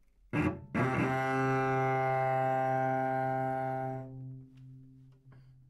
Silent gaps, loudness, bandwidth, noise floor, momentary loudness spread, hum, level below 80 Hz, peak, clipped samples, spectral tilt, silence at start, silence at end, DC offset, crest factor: none; -32 LUFS; 12 kHz; -57 dBFS; 12 LU; none; -64 dBFS; -18 dBFS; under 0.1%; -8 dB/octave; 0.35 s; 0.2 s; under 0.1%; 14 dB